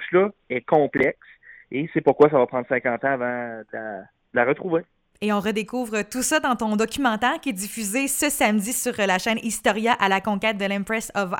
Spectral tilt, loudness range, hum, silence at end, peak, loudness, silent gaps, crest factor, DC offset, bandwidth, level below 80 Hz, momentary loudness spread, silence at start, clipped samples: -3.5 dB/octave; 3 LU; none; 0 s; -4 dBFS; -22 LUFS; none; 20 dB; under 0.1%; 18 kHz; -56 dBFS; 10 LU; 0 s; under 0.1%